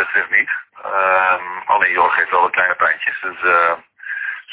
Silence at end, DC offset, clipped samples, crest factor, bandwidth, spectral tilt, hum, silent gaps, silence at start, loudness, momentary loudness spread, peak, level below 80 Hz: 0 s; under 0.1%; under 0.1%; 18 dB; 4 kHz; -5.5 dB/octave; none; none; 0 s; -16 LUFS; 10 LU; 0 dBFS; -60 dBFS